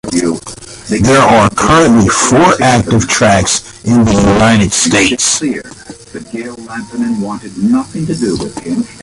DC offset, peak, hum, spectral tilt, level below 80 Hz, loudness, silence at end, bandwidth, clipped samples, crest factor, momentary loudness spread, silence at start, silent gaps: under 0.1%; 0 dBFS; none; -4 dB/octave; -32 dBFS; -10 LUFS; 0 s; 11.5 kHz; under 0.1%; 10 dB; 16 LU; 0.05 s; none